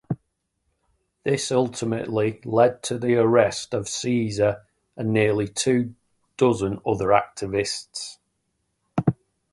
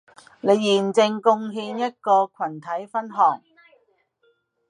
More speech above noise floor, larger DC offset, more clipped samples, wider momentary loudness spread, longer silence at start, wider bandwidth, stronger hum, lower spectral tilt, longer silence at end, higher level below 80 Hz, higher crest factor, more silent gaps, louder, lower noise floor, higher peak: first, 52 dB vs 45 dB; neither; neither; about the same, 12 LU vs 11 LU; second, 0.1 s vs 0.45 s; about the same, 11.5 kHz vs 11 kHz; neither; about the same, -5 dB/octave vs -5 dB/octave; second, 0.4 s vs 1.3 s; first, -54 dBFS vs -80 dBFS; about the same, 20 dB vs 20 dB; neither; about the same, -23 LUFS vs -22 LUFS; first, -74 dBFS vs -66 dBFS; about the same, -2 dBFS vs -4 dBFS